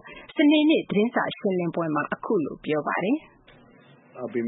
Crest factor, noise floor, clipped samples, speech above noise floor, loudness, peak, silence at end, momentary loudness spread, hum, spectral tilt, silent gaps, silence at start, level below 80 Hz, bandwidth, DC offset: 16 dB; -53 dBFS; under 0.1%; 30 dB; -24 LUFS; -10 dBFS; 0 s; 9 LU; none; -10.5 dB/octave; none; 0.05 s; -66 dBFS; 4 kHz; under 0.1%